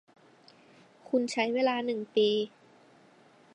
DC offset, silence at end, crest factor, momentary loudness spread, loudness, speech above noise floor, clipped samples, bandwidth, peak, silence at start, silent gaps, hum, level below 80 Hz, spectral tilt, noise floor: under 0.1%; 1.05 s; 18 dB; 6 LU; -29 LUFS; 31 dB; under 0.1%; 10.5 kHz; -14 dBFS; 1.1 s; none; none; -86 dBFS; -4 dB/octave; -59 dBFS